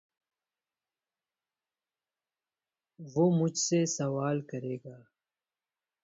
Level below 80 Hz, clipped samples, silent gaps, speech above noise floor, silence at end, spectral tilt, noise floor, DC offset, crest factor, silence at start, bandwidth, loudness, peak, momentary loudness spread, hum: -76 dBFS; under 0.1%; none; over 60 dB; 1.05 s; -5.5 dB/octave; under -90 dBFS; under 0.1%; 20 dB; 3 s; 8 kHz; -30 LUFS; -14 dBFS; 15 LU; none